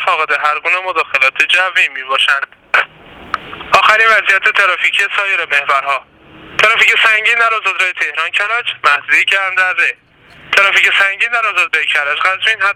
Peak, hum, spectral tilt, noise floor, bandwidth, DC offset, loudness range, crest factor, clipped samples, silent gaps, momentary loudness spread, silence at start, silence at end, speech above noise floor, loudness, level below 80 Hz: 0 dBFS; none; 0 dB/octave; -36 dBFS; 19 kHz; under 0.1%; 2 LU; 14 dB; under 0.1%; none; 7 LU; 0 s; 0 s; 23 dB; -11 LUFS; -56 dBFS